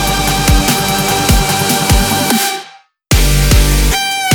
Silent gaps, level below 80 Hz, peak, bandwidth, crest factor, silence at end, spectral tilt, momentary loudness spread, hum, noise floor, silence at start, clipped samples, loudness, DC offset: none; -16 dBFS; 0 dBFS; over 20 kHz; 12 dB; 0 s; -3.5 dB/octave; 3 LU; none; -38 dBFS; 0 s; under 0.1%; -11 LUFS; under 0.1%